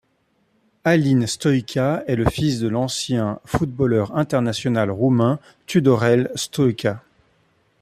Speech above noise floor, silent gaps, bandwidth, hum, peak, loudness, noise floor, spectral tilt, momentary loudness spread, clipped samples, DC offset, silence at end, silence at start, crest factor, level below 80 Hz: 46 dB; none; 14.5 kHz; none; -4 dBFS; -20 LUFS; -65 dBFS; -6 dB/octave; 7 LU; under 0.1%; under 0.1%; 0.85 s; 0.85 s; 18 dB; -46 dBFS